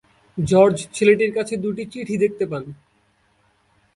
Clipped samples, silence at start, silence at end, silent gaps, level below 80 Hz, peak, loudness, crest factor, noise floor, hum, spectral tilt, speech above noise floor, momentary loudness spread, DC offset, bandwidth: under 0.1%; 0.35 s; 1.2 s; none; -54 dBFS; -2 dBFS; -20 LUFS; 18 dB; -62 dBFS; none; -6 dB/octave; 43 dB; 15 LU; under 0.1%; 11.5 kHz